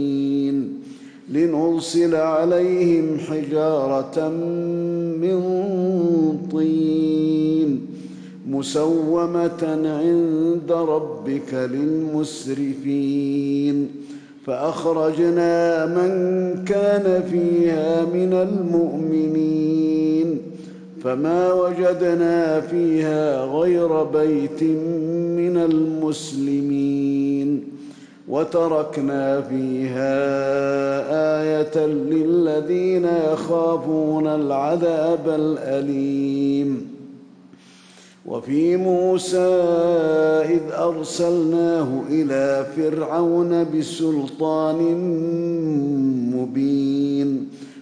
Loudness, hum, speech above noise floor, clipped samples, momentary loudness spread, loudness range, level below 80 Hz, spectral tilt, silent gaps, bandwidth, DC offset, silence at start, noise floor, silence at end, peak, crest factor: -20 LUFS; none; 28 dB; under 0.1%; 7 LU; 3 LU; -62 dBFS; -7 dB/octave; none; 10.5 kHz; under 0.1%; 0 s; -48 dBFS; 0 s; -10 dBFS; 10 dB